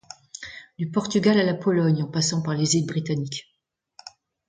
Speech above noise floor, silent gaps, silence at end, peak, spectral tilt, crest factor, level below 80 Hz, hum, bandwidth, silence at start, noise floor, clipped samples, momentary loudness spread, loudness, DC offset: 32 dB; none; 0.4 s; -6 dBFS; -5 dB/octave; 18 dB; -64 dBFS; none; 9.6 kHz; 0.4 s; -54 dBFS; under 0.1%; 20 LU; -23 LUFS; under 0.1%